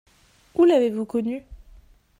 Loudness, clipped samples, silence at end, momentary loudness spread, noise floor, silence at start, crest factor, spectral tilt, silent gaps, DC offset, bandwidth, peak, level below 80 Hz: -22 LUFS; under 0.1%; 0.65 s; 13 LU; -51 dBFS; 0.55 s; 16 dB; -6.5 dB/octave; none; under 0.1%; 10.5 kHz; -8 dBFS; -52 dBFS